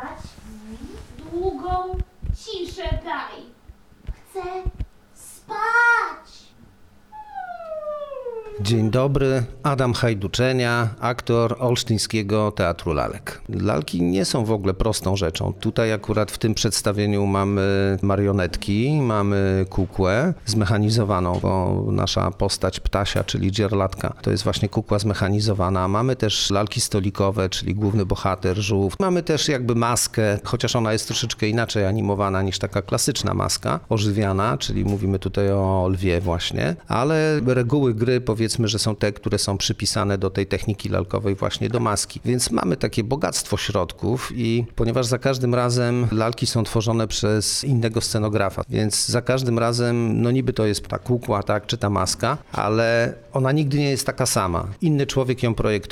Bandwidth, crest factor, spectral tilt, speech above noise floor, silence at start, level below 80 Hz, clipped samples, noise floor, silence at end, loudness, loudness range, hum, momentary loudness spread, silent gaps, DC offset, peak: 16 kHz; 16 dB; -5 dB/octave; 28 dB; 0 s; -40 dBFS; under 0.1%; -49 dBFS; 0 s; -22 LUFS; 3 LU; none; 8 LU; none; under 0.1%; -6 dBFS